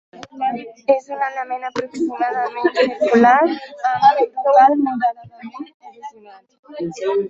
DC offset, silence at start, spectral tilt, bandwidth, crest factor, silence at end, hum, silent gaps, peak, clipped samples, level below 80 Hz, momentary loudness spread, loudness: under 0.1%; 0.15 s; -5.5 dB/octave; 7.8 kHz; 16 dB; 0 s; none; 5.74-5.80 s, 6.59-6.63 s; -2 dBFS; under 0.1%; -66 dBFS; 23 LU; -17 LUFS